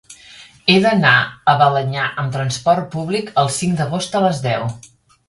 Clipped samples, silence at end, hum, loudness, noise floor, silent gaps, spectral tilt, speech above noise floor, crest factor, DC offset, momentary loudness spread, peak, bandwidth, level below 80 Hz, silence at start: under 0.1%; 0.5 s; none; -16 LUFS; -43 dBFS; none; -5 dB/octave; 26 dB; 18 dB; under 0.1%; 9 LU; 0 dBFS; 11.5 kHz; -52 dBFS; 0.1 s